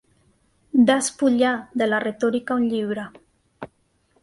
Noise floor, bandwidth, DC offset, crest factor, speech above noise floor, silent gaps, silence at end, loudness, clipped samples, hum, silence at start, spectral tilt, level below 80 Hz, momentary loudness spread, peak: -64 dBFS; 11.5 kHz; under 0.1%; 18 dB; 43 dB; none; 0.55 s; -21 LUFS; under 0.1%; none; 0.75 s; -4 dB/octave; -64 dBFS; 23 LU; -4 dBFS